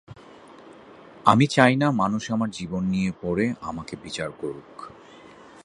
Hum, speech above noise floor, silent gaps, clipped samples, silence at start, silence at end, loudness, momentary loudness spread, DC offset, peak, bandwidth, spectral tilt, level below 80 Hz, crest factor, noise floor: none; 24 dB; none; under 0.1%; 0.1 s; 0.35 s; -23 LUFS; 18 LU; under 0.1%; 0 dBFS; 11 kHz; -6 dB/octave; -54 dBFS; 24 dB; -47 dBFS